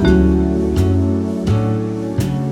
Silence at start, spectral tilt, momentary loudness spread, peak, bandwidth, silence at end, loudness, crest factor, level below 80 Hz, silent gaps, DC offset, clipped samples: 0 s; -8 dB/octave; 7 LU; -2 dBFS; 14.5 kHz; 0 s; -17 LUFS; 14 dB; -26 dBFS; none; under 0.1%; under 0.1%